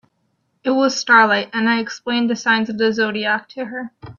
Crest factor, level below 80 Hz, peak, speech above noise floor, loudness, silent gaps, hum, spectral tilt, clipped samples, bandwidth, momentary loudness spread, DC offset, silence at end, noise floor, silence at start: 18 dB; -62 dBFS; 0 dBFS; 49 dB; -17 LUFS; none; none; -3.5 dB/octave; under 0.1%; 7.4 kHz; 15 LU; under 0.1%; 0.05 s; -67 dBFS; 0.65 s